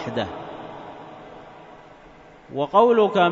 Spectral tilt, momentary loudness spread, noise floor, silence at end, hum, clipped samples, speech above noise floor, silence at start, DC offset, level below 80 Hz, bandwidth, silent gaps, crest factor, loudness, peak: -6.5 dB/octave; 25 LU; -47 dBFS; 0 s; none; under 0.1%; 28 dB; 0 s; under 0.1%; -60 dBFS; 7.4 kHz; none; 20 dB; -20 LUFS; -4 dBFS